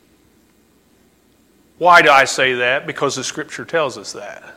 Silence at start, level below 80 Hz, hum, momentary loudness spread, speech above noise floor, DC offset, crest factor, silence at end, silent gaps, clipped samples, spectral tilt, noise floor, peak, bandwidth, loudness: 1.8 s; -60 dBFS; none; 19 LU; 39 dB; under 0.1%; 18 dB; 0.05 s; none; under 0.1%; -2.5 dB/octave; -55 dBFS; 0 dBFS; 16.5 kHz; -14 LUFS